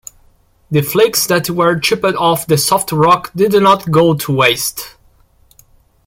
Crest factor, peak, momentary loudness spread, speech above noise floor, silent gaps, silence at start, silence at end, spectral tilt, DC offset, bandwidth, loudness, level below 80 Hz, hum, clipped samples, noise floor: 14 dB; 0 dBFS; 6 LU; 38 dB; none; 0.7 s; 1.15 s; -4 dB/octave; under 0.1%; 17 kHz; -13 LUFS; -48 dBFS; none; under 0.1%; -51 dBFS